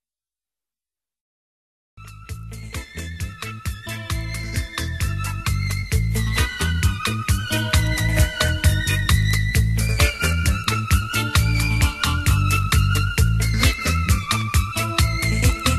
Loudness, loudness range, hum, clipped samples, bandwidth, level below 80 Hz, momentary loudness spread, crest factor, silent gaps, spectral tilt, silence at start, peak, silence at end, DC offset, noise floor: -21 LUFS; 13 LU; none; under 0.1%; 13 kHz; -26 dBFS; 12 LU; 18 dB; none; -4 dB/octave; 1.95 s; -4 dBFS; 0 s; under 0.1%; under -90 dBFS